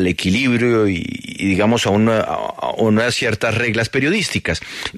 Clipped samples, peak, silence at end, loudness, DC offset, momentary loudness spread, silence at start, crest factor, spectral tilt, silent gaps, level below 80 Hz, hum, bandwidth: under 0.1%; -4 dBFS; 0 s; -17 LUFS; under 0.1%; 8 LU; 0 s; 12 dB; -5 dB/octave; none; -44 dBFS; none; 13.5 kHz